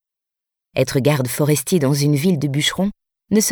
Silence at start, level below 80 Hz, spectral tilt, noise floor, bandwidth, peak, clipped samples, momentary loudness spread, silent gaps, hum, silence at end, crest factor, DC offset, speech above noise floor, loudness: 0.75 s; -52 dBFS; -5 dB/octave; -85 dBFS; over 20 kHz; -2 dBFS; under 0.1%; 6 LU; none; none; 0 s; 16 dB; under 0.1%; 68 dB; -18 LUFS